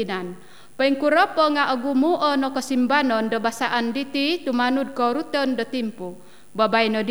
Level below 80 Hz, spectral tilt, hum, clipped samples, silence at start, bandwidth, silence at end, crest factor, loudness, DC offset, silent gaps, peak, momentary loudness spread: -70 dBFS; -4.5 dB/octave; none; under 0.1%; 0 s; over 20 kHz; 0 s; 16 dB; -21 LUFS; 0.7%; none; -6 dBFS; 9 LU